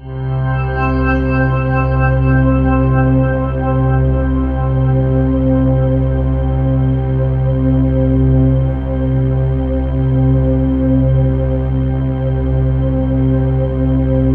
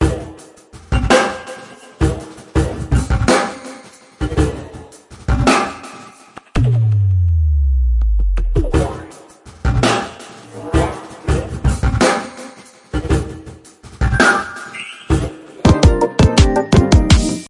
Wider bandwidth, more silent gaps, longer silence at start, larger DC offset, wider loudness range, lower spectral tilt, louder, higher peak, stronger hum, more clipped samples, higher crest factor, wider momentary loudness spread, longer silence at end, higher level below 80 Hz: second, 3.3 kHz vs 11.5 kHz; neither; about the same, 0 s vs 0 s; neither; second, 1 LU vs 5 LU; first, -12 dB/octave vs -5.5 dB/octave; about the same, -14 LUFS vs -16 LUFS; about the same, -2 dBFS vs 0 dBFS; neither; neither; about the same, 12 dB vs 16 dB; second, 4 LU vs 20 LU; about the same, 0 s vs 0 s; about the same, -20 dBFS vs -22 dBFS